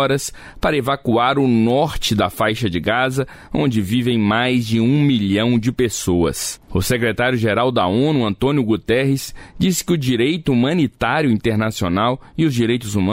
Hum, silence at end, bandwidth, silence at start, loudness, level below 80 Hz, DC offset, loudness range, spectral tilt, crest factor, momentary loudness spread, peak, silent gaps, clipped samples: none; 0 s; 16 kHz; 0 s; -18 LUFS; -40 dBFS; under 0.1%; 1 LU; -5.5 dB/octave; 12 dB; 5 LU; -6 dBFS; none; under 0.1%